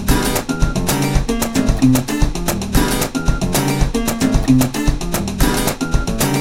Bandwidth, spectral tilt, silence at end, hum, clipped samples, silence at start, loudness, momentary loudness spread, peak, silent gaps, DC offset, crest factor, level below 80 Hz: 17 kHz; -5 dB/octave; 0 s; none; under 0.1%; 0 s; -17 LUFS; 5 LU; 0 dBFS; none; 1%; 16 dB; -22 dBFS